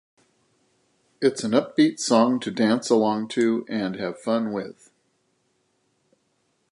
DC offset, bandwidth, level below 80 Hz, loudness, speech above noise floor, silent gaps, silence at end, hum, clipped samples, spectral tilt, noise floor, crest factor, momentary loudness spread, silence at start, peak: under 0.1%; 11.5 kHz; -72 dBFS; -23 LUFS; 48 dB; none; 2 s; none; under 0.1%; -5 dB/octave; -70 dBFS; 20 dB; 9 LU; 1.2 s; -6 dBFS